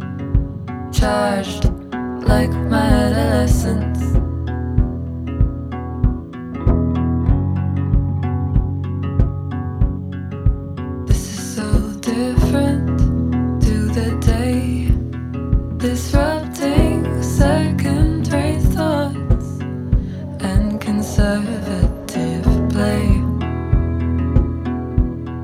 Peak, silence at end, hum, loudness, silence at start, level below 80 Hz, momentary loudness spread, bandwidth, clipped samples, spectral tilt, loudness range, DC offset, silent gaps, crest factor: 0 dBFS; 0 s; none; -19 LUFS; 0 s; -22 dBFS; 7 LU; 15.5 kHz; under 0.1%; -7 dB/octave; 3 LU; under 0.1%; none; 18 dB